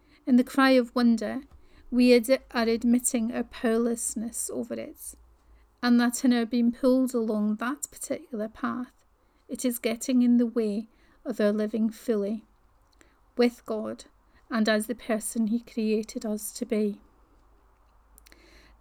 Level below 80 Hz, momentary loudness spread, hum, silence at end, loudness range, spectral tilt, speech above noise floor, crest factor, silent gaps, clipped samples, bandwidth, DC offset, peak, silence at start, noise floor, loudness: -58 dBFS; 14 LU; none; 1.85 s; 5 LU; -4 dB/octave; 38 dB; 20 dB; none; under 0.1%; 16.5 kHz; under 0.1%; -8 dBFS; 0.25 s; -64 dBFS; -26 LUFS